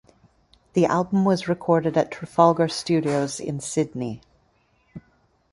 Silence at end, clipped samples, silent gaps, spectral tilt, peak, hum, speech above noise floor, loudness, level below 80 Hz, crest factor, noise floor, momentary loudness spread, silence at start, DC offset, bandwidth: 0.55 s; under 0.1%; none; -6 dB/octave; -2 dBFS; none; 42 dB; -23 LUFS; -60 dBFS; 22 dB; -64 dBFS; 10 LU; 0.75 s; under 0.1%; 11.5 kHz